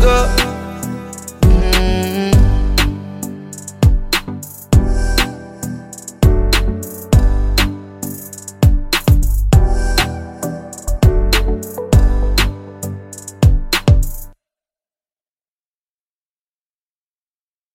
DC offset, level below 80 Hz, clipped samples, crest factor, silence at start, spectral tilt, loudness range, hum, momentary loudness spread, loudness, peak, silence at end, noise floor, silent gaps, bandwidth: under 0.1%; -18 dBFS; under 0.1%; 14 dB; 0 s; -5 dB/octave; 4 LU; none; 14 LU; -16 LUFS; 0 dBFS; 3.45 s; under -90 dBFS; none; 16.5 kHz